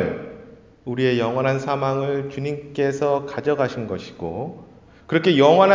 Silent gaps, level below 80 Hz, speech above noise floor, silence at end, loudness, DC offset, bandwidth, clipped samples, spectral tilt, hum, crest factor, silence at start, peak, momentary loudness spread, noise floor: none; -54 dBFS; 25 dB; 0 s; -22 LUFS; under 0.1%; 7.6 kHz; under 0.1%; -6.5 dB/octave; none; 20 dB; 0 s; -2 dBFS; 14 LU; -45 dBFS